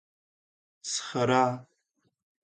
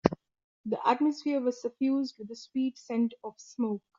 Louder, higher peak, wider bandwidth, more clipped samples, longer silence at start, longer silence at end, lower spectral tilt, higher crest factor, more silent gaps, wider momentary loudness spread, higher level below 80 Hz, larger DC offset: first, -28 LUFS vs -31 LUFS; second, -10 dBFS vs -4 dBFS; first, 9.6 kHz vs 7.6 kHz; neither; first, 0.85 s vs 0.05 s; first, 0.8 s vs 0.2 s; second, -4 dB/octave vs -5.5 dB/octave; second, 22 dB vs 28 dB; second, none vs 0.44-0.64 s; about the same, 17 LU vs 16 LU; second, -74 dBFS vs -64 dBFS; neither